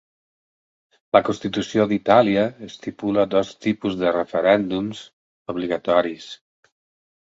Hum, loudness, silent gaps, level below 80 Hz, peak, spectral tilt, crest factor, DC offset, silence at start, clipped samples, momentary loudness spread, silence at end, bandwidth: none; -21 LUFS; 5.13-5.45 s; -58 dBFS; 0 dBFS; -6 dB/octave; 22 dB; under 0.1%; 1.15 s; under 0.1%; 17 LU; 1.05 s; 7.8 kHz